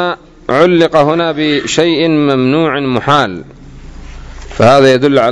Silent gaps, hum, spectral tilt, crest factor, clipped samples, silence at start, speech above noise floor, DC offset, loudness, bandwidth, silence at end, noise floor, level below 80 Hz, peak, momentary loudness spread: none; none; -5.5 dB/octave; 10 dB; 1%; 0 s; 20 dB; under 0.1%; -10 LUFS; 11 kHz; 0 s; -30 dBFS; -36 dBFS; 0 dBFS; 11 LU